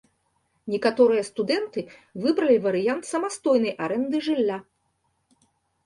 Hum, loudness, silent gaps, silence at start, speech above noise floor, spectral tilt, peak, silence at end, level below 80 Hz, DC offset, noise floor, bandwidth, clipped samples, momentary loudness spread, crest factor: none; -24 LUFS; none; 0.65 s; 49 dB; -5 dB/octave; -8 dBFS; 1.25 s; -70 dBFS; under 0.1%; -72 dBFS; 11.5 kHz; under 0.1%; 12 LU; 18 dB